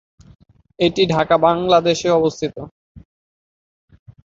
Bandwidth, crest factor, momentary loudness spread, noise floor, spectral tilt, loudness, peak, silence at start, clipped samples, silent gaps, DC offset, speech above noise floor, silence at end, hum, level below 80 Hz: 7.8 kHz; 18 dB; 12 LU; under -90 dBFS; -5.5 dB/octave; -17 LUFS; -2 dBFS; 0.8 s; under 0.1%; 2.71-2.95 s; under 0.1%; over 74 dB; 1.35 s; none; -50 dBFS